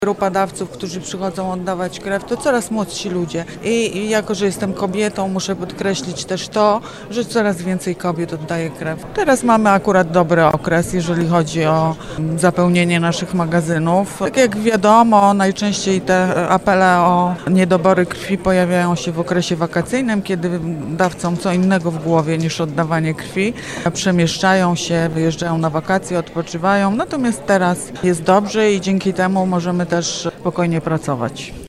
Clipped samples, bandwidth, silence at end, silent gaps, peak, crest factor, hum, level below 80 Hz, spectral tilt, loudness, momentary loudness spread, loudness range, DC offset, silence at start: under 0.1%; 13 kHz; 0 s; none; 0 dBFS; 16 dB; none; -46 dBFS; -5.5 dB/octave; -17 LUFS; 9 LU; 5 LU; under 0.1%; 0 s